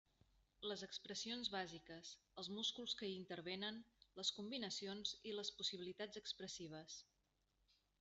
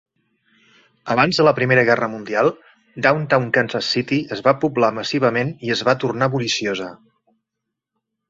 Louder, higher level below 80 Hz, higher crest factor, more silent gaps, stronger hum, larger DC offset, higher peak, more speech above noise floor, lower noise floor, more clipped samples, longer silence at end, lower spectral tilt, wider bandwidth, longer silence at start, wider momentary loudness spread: second, -48 LUFS vs -18 LUFS; second, -82 dBFS vs -60 dBFS; about the same, 22 dB vs 20 dB; neither; neither; neither; second, -28 dBFS vs 0 dBFS; second, 35 dB vs 63 dB; first, -85 dBFS vs -81 dBFS; neither; second, 0.95 s vs 1.35 s; second, -2.5 dB/octave vs -5 dB/octave; about the same, 8.2 kHz vs 8 kHz; second, 0.6 s vs 1.05 s; first, 11 LU vs 7 LU